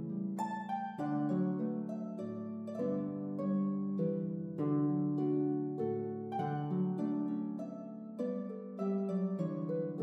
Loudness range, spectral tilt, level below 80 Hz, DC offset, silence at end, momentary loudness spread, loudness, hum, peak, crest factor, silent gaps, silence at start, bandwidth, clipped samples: 3 LU; -10 dB/octave; -86 dBFS; under 0.1%; 0 s; 8 LU; -37 LUFS; none; -22 dBFS; 14 dB; none; 0 s; 7.6 kHz; under 0.1%